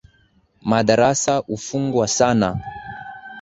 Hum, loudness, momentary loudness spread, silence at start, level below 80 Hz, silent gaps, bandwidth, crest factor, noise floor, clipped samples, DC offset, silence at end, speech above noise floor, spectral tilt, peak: none; -19 LUFS; 18 LU; 0.65 s; -50 dBFS; none; 8.2 kHz; 18 dB; -59 dBFS; under 0.1%; under 0.1%; 0 s; 40 dB; -4.5 dB/octave; -2 dBFS